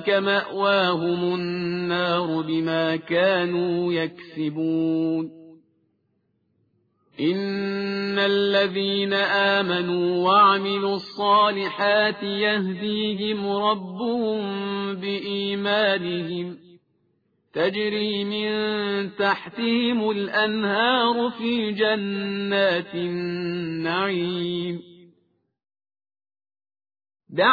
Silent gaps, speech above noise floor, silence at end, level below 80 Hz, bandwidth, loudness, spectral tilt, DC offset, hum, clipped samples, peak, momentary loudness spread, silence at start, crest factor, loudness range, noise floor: none; 47 dB; 0 s; -66 dBFS; 5 kHz; -23 LUFS; -7.5 dB/octave; under 0.1%; none; under 0.1%; -6 dBFS; 8 LU; 0 s; 18 dB; 8 LU; -70 dBFS